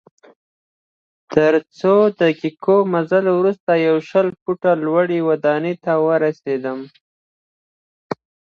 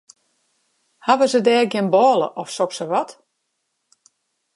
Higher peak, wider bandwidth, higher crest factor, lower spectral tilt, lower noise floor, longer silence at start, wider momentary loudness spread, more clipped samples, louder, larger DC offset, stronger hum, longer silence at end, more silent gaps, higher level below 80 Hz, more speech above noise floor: about the same, 0 dBFS vs -2 dBFS; second, 7 kHz vs 11.5 kHz; about the same, 18 dB vs 20 dB; first, -8 dB/octave vs -4.5 dB/octave; first, under -90 dBFS vs -74 dBFS; first, 1.3 s vs 1.05 s; about the same, 8 LU vs 10 LU; neither; about the same, -17 LUFS vs -18 LUFS; neither; neither; second, 0.4 s vs 1.45 s; first, 3.60-3.67 s, 4.42-4.46 s, 7.01-8.10 s vs none; first, -64 dBFS vs -78 dBFS; first, over 73 dB vs 56 dB